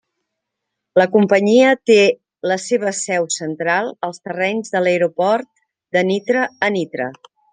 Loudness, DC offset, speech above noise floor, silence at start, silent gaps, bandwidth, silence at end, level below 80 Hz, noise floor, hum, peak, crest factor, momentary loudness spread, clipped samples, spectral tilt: -17 LUFS; under 0.1%; 62 dB; 0.95 s; none; 9.8 kHz; 0.35 s; -68 dBFS; -79 dBFS; none; 0 dBFS; 16 dB; 12 LU; under 0.1%; -4.5 dB/octave